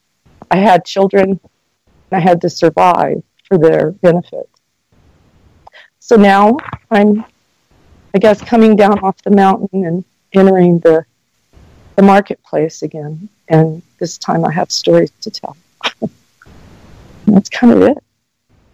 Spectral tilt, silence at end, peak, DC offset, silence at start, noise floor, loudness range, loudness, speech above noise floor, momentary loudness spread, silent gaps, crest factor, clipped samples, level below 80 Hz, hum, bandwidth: -6.5 dB/octave; 0.75 s; 0 dBFS; under 0.1%; 0.5 s; -59 dBFS; 5 LU; -12 LUFS; 49 dB; 15 LU; none; 12 dB; under 0.1%; -50 dBFS; none; 9.6 kHz